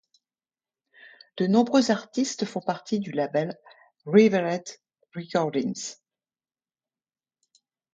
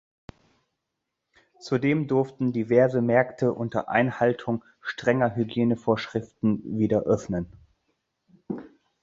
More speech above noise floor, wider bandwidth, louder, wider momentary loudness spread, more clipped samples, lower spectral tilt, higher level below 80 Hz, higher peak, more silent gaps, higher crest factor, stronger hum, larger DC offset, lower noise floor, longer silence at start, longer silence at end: first, over 66 dB vs 58 dB; first, 9.2 kHz vs 7.6 kHz; about the same, -25 LUFS vs -25 LUFS; first, 21 LU vs 12 LU; neither; second, -5.5 dB/octave vs -7.5 dB/octave; second, -74 dBFS vs -58 dBFS; about the same, -6 dBFS vs -6 dBFS; neither; about the same, 22 dB vs 20 dB; neither; neither; first, under -90 dBFS vs -82 dBFS; second, 1.35 s vs 1.6 s; first, 2 s vs 0.35 s